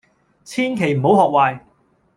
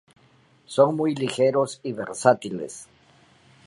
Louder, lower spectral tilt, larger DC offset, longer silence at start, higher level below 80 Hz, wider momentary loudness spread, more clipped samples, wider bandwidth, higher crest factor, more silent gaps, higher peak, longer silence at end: first, -17 LUFS vs -23 LUFS; about the same, -6.5 dB/octave vs -5.5 dB/octave; neither; second, 0.5 s vs 0.7 s; first, -60 dBFS vs -70 dBFS; about the same, 13 LU vs 13 LU; neither; first, 13 kHz vs 11.5 kHz; about the same, 18 dB vs 22 dB; neither; about the same, 0 dBFS vs -2 dBFS; second, 0.6 s vs 0.8 s